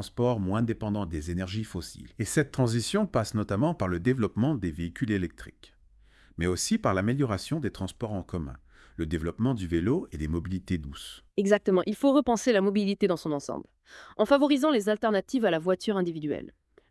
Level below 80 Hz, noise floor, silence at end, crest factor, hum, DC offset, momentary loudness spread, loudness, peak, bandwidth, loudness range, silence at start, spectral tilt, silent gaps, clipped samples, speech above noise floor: -52 dBFS; -59 dBFS; 0.4 s; 20 dB; none; under 0.1%; 13 LU; -28 LUFS; -8 dBFS; 12 kHz; 5 LU; 0 s; -6 dB/octave; none; under 0.1%; 31 dB